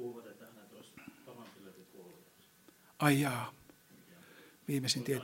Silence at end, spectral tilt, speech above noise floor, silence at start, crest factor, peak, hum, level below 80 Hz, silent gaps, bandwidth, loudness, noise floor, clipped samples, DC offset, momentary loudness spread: 0 s; -4.5 dB/octave; 31 dB; 0 s; 26 dB; -12 dBFS; none; -78 dBFS; none; 16.5 kHz; -34 LUFS; -64 dBFS; under 0.1%; under 0.1%; 27 LU